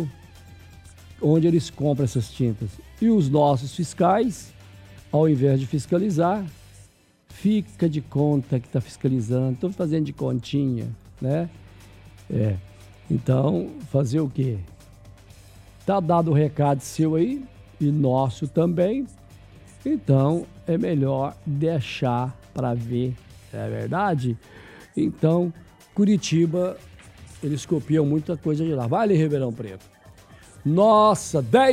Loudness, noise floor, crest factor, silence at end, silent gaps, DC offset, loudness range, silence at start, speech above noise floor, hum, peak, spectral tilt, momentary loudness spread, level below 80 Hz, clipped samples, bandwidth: -23 LUFS; -54 dBFS; 20 dB; 0 s; none; under 0.1%; 4 LU; 0 s; 32 dB; none; -4 dBFS; -7.5 dB/octave; 12 LU; -52 dBFS; under 0.1%; 13.5 kHz